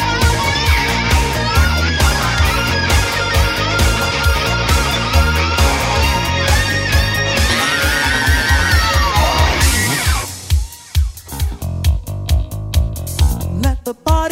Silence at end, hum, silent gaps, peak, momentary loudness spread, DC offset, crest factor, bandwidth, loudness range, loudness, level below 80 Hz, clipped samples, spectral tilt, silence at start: 0 s; none; none; -2 dBFS; 7 LU; under 0.1%; 12 dB; 16.5 kHz; 6 LU; -15 LUFS; -18 dBFS; under 0.1%; -3.5 dB/octave; 0 s